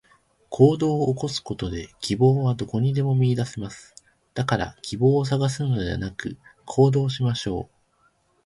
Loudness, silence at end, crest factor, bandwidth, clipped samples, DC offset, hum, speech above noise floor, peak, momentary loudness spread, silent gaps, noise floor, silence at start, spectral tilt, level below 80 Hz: -23 LUFS; 0.8 s; 20 dB; 11.5 kHz; under 0.1%; under 0.1%; none; 42 dB; -4 dBFS; 16 LU; none; -65 dBFS; 0.5 s; -7 dB/octave; -48 dBFS